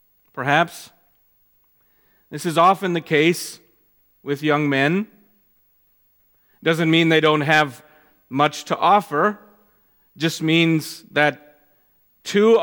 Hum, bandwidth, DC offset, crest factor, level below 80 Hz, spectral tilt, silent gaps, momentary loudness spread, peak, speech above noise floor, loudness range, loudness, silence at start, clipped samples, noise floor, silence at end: none; 19 kHz; under 0.1%; 20 dB; -70 dBFS; -5 dB/octave; none; 14 LU; 0 dBFS; 43 dB; 4 LU; -19 LUFS; 0.35 s; under 0.1%; -61 dBFS; 0 s